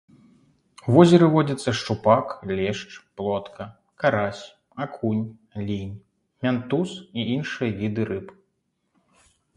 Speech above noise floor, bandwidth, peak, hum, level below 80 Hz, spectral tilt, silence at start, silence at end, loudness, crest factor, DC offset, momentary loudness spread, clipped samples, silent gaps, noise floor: 51 dB; 11 kHz; 0 dBFS; none; -56 dBFS; -7 dB/octave; 0.85 s; 1.25 s; -23 LUFS; 24 dB; under 0.1%; 20 LU; under 0.1%; none; -74 dBFS